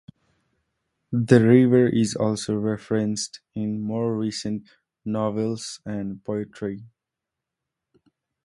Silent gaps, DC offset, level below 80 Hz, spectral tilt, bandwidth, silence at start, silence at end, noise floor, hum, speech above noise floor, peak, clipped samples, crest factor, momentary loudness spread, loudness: none; under 0.1%; -60 dBFS; -6.5 dB/octave; 11.5 kHz; 1.1 s; 1.6 s; -86 dBFS; none; 63 dB; -2 dBFS; under 0.1%; 24 dB; 16 LU; -23 LUFS